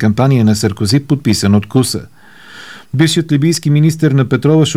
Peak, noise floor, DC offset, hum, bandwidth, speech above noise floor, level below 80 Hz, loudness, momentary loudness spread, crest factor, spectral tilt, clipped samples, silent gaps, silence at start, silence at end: 0 dBFS; -37 dBFS; 0.8%; none; 15.5 kHz; 26 dB; -46 dBFS; -12 LUFS; 7 LU; 12 dB; -6 dB/octave; under 0.1%; none; 0 s; 0 s